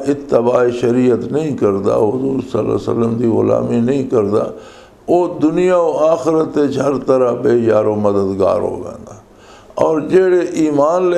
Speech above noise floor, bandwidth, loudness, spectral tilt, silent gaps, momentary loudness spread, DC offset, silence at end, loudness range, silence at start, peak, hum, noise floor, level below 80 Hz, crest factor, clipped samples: 27 dB; 10.5 kHz; -15 LUFS; -7.5 dB/octave; none; 6 LU; under 0.1%; 0 s; 2 LU; 0 s; 0 dBFS; none; -41 dBFS; -48 dBFS; 14 dB; under 0.1%